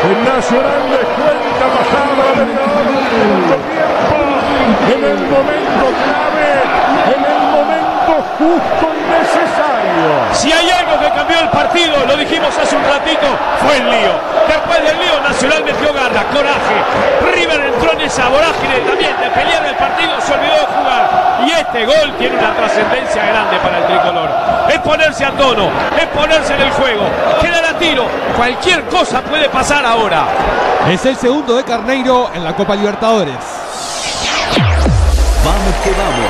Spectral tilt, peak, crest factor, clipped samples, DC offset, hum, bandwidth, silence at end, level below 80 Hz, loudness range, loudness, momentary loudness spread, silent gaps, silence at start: -4 dB/octave; 0 dBFS; 12 dB; under 0.1%; under 0.1%; none; 13.5 kHz; 0 s; -26 dBFS; 1 LU; -12 LUFS; 3 LU; none; 0 s